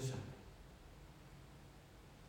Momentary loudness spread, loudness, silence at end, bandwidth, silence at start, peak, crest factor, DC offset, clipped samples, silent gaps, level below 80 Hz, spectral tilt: 11 LU; -55 LUFS; 0 s; 16.5 kHz; 0 s; -30 dBFS; 20 dB; under 0.1%; under 0.1%; none; -64 dBFS; -5.5 dB/octave